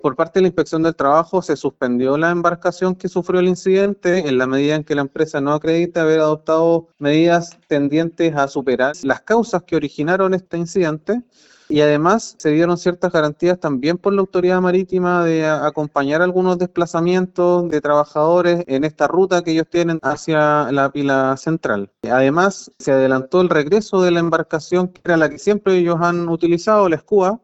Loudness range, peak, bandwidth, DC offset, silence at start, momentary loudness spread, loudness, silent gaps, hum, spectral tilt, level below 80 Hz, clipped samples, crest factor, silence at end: 1 LU; -2 dBFS; 8.2 kHz; under 0.1%; 0.05 s; 5 LU; -17 LUFS; none; none; -6.5 dB/octave; -54 dBFS; under 0.1%; 16 dB; 0.05 s